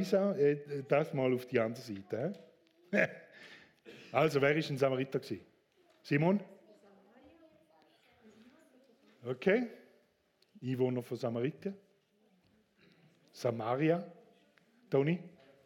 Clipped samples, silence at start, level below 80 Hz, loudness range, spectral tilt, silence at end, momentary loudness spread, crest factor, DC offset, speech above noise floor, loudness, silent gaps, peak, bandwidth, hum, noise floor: under 0.1%; 0 s; -82 dBFS; 6 LU; -7 dB/octave; 0.35 s; 22 LU; 22 dB; under 0.1%; 40 dB; -34 LUFS; none; -14 dBFS; 16.5 kHz; none; -73 dBFS